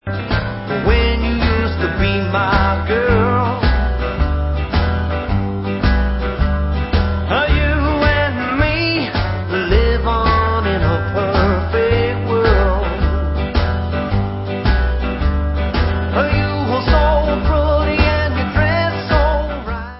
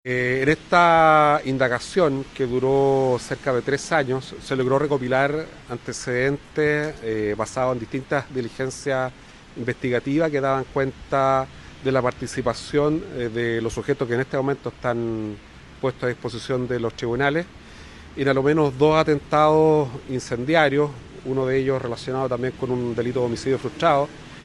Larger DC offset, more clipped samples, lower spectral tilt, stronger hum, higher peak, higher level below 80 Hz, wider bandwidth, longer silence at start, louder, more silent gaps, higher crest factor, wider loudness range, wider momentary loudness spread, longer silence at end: neither; neither; first, -10.5 dB/octave vs -6 dB/octave; neither; about the same, 0 dBFS vs -2 dBFS; first, -20 dBFS vs -48 dBFS; second, 5.8 kHz vs 12 kHz; about the same, 0.05 s vs 0.05 s; first, -17 LUFS vs -22 LUFS; neither; about the same, 16 dB vs 20 dB; second, 3 LU vs 6 LU; second, 5 LU vs 11 LU; about the same, 0 s vs 0.05 s